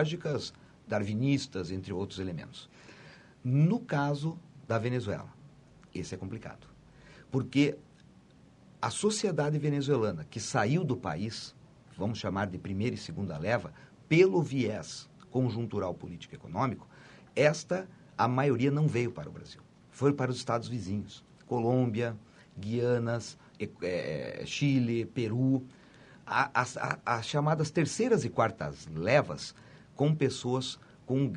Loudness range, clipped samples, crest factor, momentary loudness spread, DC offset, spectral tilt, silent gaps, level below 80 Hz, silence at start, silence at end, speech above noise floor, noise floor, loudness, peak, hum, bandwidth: 5 LU; under 0.1%; 22 dB; 16 LU; under 0.1%; -6 dB/octave; none; -64 dBFS; 0 s; 0 s; 28 dB; -58 dBFS; -31 LUFS; -10 dBFS; none; 11 kHz